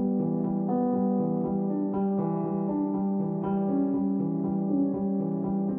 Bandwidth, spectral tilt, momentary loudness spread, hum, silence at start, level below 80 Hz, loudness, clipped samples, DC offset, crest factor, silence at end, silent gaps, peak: 2.5 kHz; -14 dB/octave; 2 LU; none; 0 s; -60 dBFS; -28 LUFS; under 0.1%; under 0.1%; 12 dB; 0 s; none; -16 dBFS